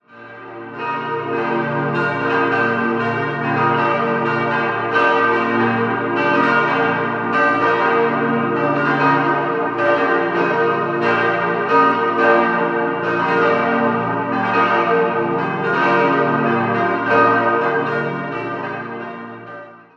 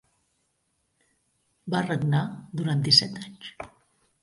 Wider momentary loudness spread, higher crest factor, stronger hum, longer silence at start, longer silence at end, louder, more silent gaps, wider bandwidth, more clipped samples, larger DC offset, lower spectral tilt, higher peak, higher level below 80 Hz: second, 10 LU vs 24 LU; second, 16 dB vs 26 dB; neither; second, 0.15 s vs 1.65 s; second, 0.2 s vs 0.55 s; first, -17 LUFS vs -24 LUFS; neither; second, 7.2 kHz vs 11.5 kHz; neither; neither; first, -7.5 dB/octave vs -4.5 dB/octave; first, 0 dBFS vs -4 dBFS; about the same, -62 dBFS vs -64 dBFS